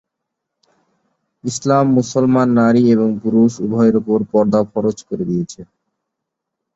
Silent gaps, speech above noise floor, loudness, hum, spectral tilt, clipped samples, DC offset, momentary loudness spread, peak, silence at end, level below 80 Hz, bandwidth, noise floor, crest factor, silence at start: none; 64 dB; -15 LUFS; none; -7 dB/octave; under 0.1%; under 0.1%; 10 LU; -2 dBFS; 1.1 s; -54 dBFS; 8 kHz; -79 dBFS; 14 dB; 1.45 s